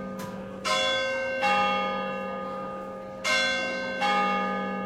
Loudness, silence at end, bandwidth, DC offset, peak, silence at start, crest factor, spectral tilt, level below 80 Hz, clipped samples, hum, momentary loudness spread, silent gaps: -27 LUFS; 0 s; 15.5 kHz; under 0.1%; -12 dBFS; 0 s; 16 dB; -3 dB/octave; -62 dBFS; under 0.1%; none; 12 LU; none